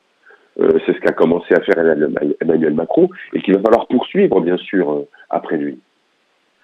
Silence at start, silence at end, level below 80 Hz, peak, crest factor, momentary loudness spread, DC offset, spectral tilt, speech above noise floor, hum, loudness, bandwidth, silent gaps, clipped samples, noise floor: 0.55 s; 0.9 s; -56 dBFS; 0 dBFS; 16 dB; 9 LU; under 0.1%; -8.5 dB/octave; 46 dB; none; -16 LUFS; 5.8 kHz; none; under 0.1%; -61 dBFS